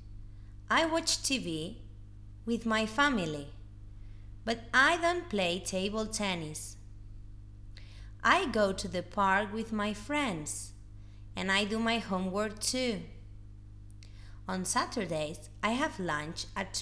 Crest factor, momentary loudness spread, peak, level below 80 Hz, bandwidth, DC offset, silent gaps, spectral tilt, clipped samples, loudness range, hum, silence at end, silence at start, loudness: 22 dB; 24 LU; -10 dBFS; -50 dBFS; 11 kHz; 0.1%; none; -3.5 dB/octave; under 0.1%; 4 LU; none; 0 s; 0 s; -31 LUFS